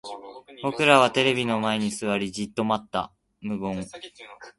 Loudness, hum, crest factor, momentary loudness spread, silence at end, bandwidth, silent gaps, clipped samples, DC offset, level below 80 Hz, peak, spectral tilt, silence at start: -24 LUFS; none; 24 dB; 23 LU; 0.1 s; 11.5 kHz; none; under 0.1%; under 0.1%; -60 dBFS; -2 dBFS; -4.5 dB/octave; 0.05 s